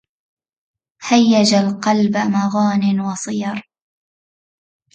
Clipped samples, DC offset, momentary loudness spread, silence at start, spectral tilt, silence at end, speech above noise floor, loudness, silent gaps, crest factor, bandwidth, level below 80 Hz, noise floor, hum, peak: under 0.1%; under 0.1%; 11 LU; 1 s; -5 dB/octave; 1.35 s; over 74 dB; -16 LUFS; none; 16 dB; 9 kHz; -62 dBFS; under -90 dBFS; none; -2 dBFS